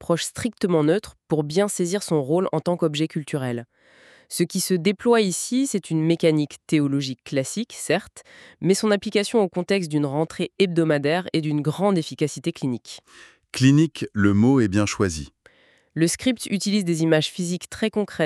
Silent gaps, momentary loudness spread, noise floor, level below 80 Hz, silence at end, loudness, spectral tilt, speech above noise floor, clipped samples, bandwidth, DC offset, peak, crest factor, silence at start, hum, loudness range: none; 8 LU; -56 dBFS; -56 dBFS; 0 s; -22 LUFS; -5.5 dB/octave; 34 dB; under 0.1%; 13.5 kHz; under 0.1%; -4 dBFS; 18 dB; 0 s; none; 2 LU